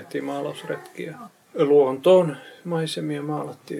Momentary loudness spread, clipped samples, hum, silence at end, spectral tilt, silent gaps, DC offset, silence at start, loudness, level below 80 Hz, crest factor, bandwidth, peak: 19 LU; under 0.1%; none; 0 s; -6.5 dB/octave; none; under 0.1%; 0 s; -22 LUFS; -78 dBFS; 18 dB; 14 kHz; -6 dBFS